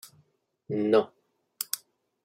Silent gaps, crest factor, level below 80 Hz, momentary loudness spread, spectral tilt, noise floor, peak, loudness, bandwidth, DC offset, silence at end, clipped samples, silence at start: none; 22 dB; -80 dBFS; 13 LU; -4.5 dB/octave; -69 dBFS; -8 dBFS; -29 LUFS; 16.5 kHz; under 0.1%; 0.45 s; under 0.1%; 0.7 s